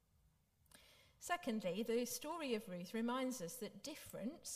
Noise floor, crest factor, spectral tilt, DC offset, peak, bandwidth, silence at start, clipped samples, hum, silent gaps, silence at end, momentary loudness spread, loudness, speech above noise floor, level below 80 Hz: -76 dBFS; 18 dB; -4 dB/octave; under 0.1%; -26 dBFS; 15.5 kHz; 0.75 s; under 0.1%; none; none; 0 s; 9 LU; -44 LUFS; 32 dB; -76 dBFS